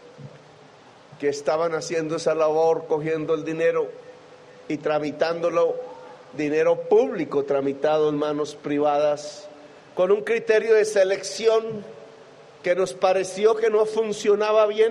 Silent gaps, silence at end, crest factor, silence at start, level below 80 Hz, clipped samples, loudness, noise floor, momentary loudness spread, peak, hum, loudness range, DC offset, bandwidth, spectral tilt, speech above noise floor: none; 0 s; 16 dB; 0.05 s; -70 dBFS; under 0.1%; -22 LUFS; -49 dBFS; 11 LU; -6 dBFS; none; 3 LU; under 0.1%; 11 kHz; -4.5 dB/octave; 27 dB